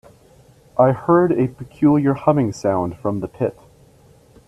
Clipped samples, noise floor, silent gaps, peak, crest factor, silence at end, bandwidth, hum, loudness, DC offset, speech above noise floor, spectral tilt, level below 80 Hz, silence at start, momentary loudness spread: under 0.1%; -50 dBFS; none; 0 dBFS; 18 dB; 0.95 s; 11 kHz; none; -19 LUFS; under 0.1%; 33 dB; -8.5 dB/octave; -52 dBFS; 0.75 s; 9 LU